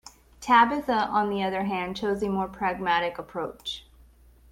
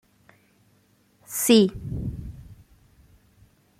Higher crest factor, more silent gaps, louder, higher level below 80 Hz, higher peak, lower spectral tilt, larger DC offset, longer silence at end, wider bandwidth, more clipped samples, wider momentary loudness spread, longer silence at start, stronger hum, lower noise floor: about the same, 20 dB vs 22 dB; neither; second, -26 LUFS vs -22 LUFS; second, -54 dBFS vs -46 dBFS; about the same, -6 dBFS vs -6 dBFS; about the same, -5 dB/octave vs -4.5 dB/octave; neither; second, 0.7 s vs 1.25 s; about the same, 16.5 kHz vs 16 kHz; neither; second, 15 LU vs 24 LU; second, 0.05 s vs 1.3 s; neither; second, -55 dBFS vs -63 dBFS